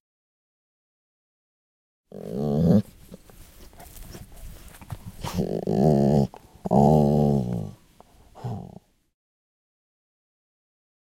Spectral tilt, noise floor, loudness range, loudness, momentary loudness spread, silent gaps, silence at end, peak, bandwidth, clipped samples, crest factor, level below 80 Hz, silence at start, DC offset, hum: -9 dB/octave; -54 dBFS; 12 LU; -23 LUFS; 25 LU; none; 2.45 s; -8 dBFS; 16.5 kHz; under 0.1%; 20 dB; -46 dBFS; 2.15 s; under 0.1%; none